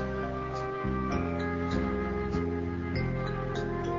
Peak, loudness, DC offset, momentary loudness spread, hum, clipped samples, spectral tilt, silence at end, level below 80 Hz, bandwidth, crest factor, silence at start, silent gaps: -18 dBFS; -32 LUFS; under 0.1%; 3 LU; none; under 0.1%; -8 dB/octave; 0 s; -40 dBFS; 7.6 kHz; 12 dB; 0 s; none